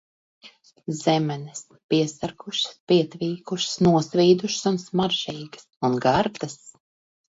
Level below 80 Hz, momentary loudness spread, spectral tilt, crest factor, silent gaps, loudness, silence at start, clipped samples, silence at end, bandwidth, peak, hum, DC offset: -60 dBFS; 16 LU; -5 dB/octave; 18 dB; 1.84-1.89 s, 2.80-2.87 s, 5.77-5.81 s; -23 LUFS; 0.45 s; under 0.1%; 0.6 s; 8 kHz; -6 dBFS; none; under 0.1%